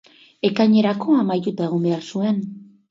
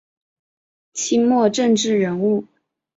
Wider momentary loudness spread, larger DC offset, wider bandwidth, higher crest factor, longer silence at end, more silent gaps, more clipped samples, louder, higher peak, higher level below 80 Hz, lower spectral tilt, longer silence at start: about the same, 8 LU vs 9 LU; neither; about the same, 7.6 kHz vs 8 kHz; about the same, 14 dB vs 14 dB; second, 0.25 s vs 0.5 s; neither; neither; about the same, -20 LUFS vs -18 LUFS; about the same, -6 dBFS vs -6 dBFS; about the same, -68 dBFS vs -64 dBFS; first, -7.5 dB/octave vs -4.5 dB/octave; second, 0.45 s vs 0.95 s